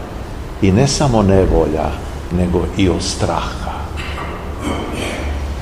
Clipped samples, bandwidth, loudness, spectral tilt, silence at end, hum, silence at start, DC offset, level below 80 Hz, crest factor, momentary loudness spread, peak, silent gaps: under 0.1%; 15.5 kHz; -17 LUFS; -5.5 dB/octave; 0 s; none; 0 s; 0.7%; -24 dBFS; 16 dB; 12 LU; 0 dBFS; none